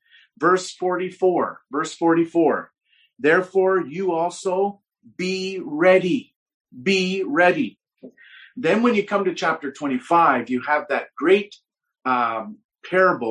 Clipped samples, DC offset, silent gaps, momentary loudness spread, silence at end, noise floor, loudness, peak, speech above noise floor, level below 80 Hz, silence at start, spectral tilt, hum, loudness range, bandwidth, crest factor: under 0.1%; under 0.1%; 6.36-6.46 s, 6.54-6.65 s, 12.65-12.69 s; 10 LU; 0 s; -47 dBFS; -21 LUFS; -2 dBFS; 27 dB; -70 dBFS; 0.4 s; -5 dB/octave; none; 1 LU; 10.5 kHz; 18 dB